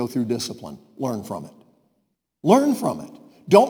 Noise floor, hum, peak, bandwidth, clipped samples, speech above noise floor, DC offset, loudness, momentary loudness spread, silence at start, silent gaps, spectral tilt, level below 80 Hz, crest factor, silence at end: -73 dBFS; none; 0 dBFS; over 20 kHz; under 0.1%; 50 dB; under 0.1%; -22 LUFS; 23 LU; 0 s; none; -6 dB/octave; -68 dBFS; 22 dB; 0 s